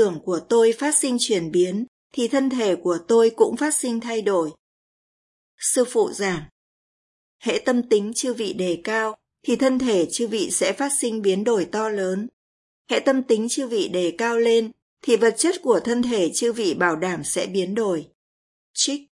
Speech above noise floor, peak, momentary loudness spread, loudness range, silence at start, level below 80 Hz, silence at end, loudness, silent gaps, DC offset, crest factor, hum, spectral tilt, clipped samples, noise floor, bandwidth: over 69 dB; -4 dBFS; 7 LU; 4 LU; 0 s; -64 dBFS; 0.1 s; -22 LUFS; 1.88-2.10 s, 4.59-5.58 s, 6.51-7.40 s, 12.33-12.85 s, 14.82-14.97 s, 18.15-18.74 s; under 0.1%; 18 dB; none; -3.5 dB/octave; under 0.1%; under -90 dBFS; 12 kHz